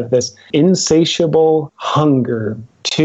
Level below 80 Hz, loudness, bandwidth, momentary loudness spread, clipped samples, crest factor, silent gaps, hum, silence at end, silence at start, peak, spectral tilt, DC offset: -52 dBFS; -15 LUFS; 8.2 kHz; 8 LU; under 0.1%; 12 dB; none; none; 0 s; 0 s; -2 dBFS; -5 dB/octave; under 0.1%